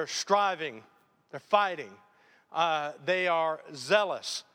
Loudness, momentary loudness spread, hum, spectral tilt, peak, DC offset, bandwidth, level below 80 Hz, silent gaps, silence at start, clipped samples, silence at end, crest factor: -29 LUFS; 13 LU; none; -2.5 dB/octave; -10 dBFS; under 0.1%; 16 kHz; -88 dBFS; none; 0 s; under 0.1%; 0.15 s; 22 dB